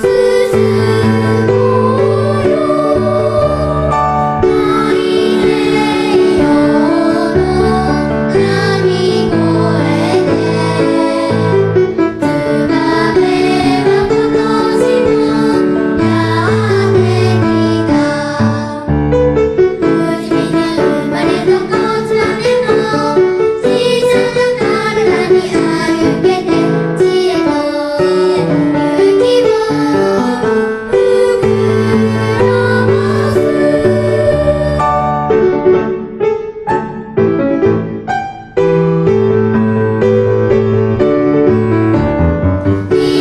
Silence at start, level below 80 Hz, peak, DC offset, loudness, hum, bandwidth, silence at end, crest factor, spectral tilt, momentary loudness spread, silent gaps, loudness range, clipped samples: 0 s; -32 dBFS; 0 dBFS; under 0.1%; -12 LUFS; none; 12 kHz; 0 s; 10 dB; -7 dB/octave; 3 LU; none; 2 LU; under 0.1%